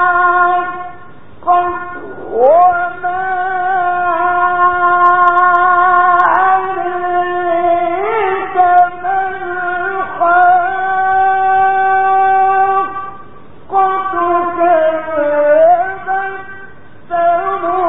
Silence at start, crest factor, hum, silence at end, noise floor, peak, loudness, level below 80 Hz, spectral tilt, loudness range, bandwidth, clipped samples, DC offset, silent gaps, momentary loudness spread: 0 s; 12 dB; none; 0 s; -38 dBFS; 0 dBFS; -12 LUFS; -52 dBFS; -2.5 dB/octave; 3 LU; 3.9 kHz; under 0.1%; 2%; none; 10 LU